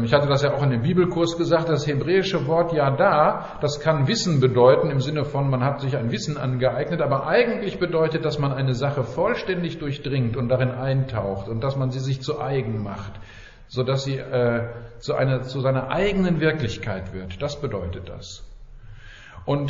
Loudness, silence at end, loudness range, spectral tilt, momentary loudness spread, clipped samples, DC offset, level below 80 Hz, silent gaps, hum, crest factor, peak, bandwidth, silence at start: -23 LUFS; 0 s; 7 LU; -5.5 dB/octave; 11 LU; under 0.1%; under 0.1%; -44 dBFS; none; none; 20 dB; -2 dBFS; 7.4 kHz; 0 s